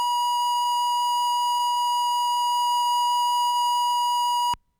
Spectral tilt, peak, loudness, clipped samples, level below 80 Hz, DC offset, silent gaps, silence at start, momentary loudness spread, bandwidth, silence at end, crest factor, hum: 2.5 dB/octave; -20 dBFS; -22 LUFS; under 0.1%; -64 dBFS; under 0.1%; none; 0 s; 1 LU; over 20 kHz; 0.25 s; 4 dB; none